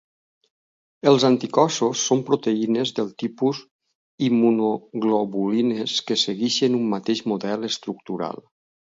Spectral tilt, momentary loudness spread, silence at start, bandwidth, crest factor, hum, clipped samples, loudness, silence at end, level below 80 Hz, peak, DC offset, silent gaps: -4.5 dB/octave; 10 LU; 1.05 s; 7.8 kHz; 20 dB; none; under 0.1%; -22 LUFS; 0.5 s; -70 dBFS; -2 dBFS; under 0.1%; 3.71-3.79 s, 3.95-4.18 s